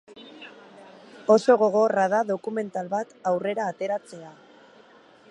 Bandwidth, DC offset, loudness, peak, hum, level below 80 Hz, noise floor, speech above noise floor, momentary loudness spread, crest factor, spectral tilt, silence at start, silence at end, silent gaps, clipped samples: 11 kHz; under 0.1%; -24 LUFS; -6 dBFS; none; -80 dBFS; -53 dBFS; 30 dB; 24 LU; 20 dB; -5.5 dB/octave; 0.1 s; 1 s; none; under 0.1%